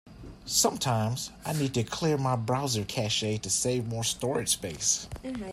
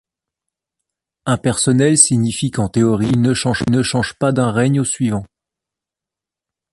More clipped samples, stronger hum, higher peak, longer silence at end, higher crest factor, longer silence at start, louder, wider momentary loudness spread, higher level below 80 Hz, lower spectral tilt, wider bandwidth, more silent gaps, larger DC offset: neither; neither; second, -10 dBFS vs 0 dBFS; second, 0 s vs 1.5 s; about the same, 20 dB vs 18 dB; second, 0.05 s vs 1.25 s; second, -28 LUFS vs -16 LUFS; about the same, 8 LU vs 9 LU; second, -54 dBFS vs -46 dBFS; about the same, -3.5 dB/octave vs -4.5 dB/octave; first, 16 kHz vs 11.5 kHz; neither; neither